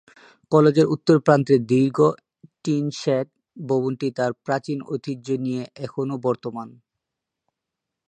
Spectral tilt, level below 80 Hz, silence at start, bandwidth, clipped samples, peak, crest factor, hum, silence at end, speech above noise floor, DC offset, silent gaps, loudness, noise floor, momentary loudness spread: -7.5 dB/octave; -68 dBFS; 0.5 s; 9.8 kHz; under 0.1%; -2 dBFS; 22 dB; none; 1.4 s; 63 dB; under 0.1%; none; -22 LUFS; -84 dBFS; 15 LU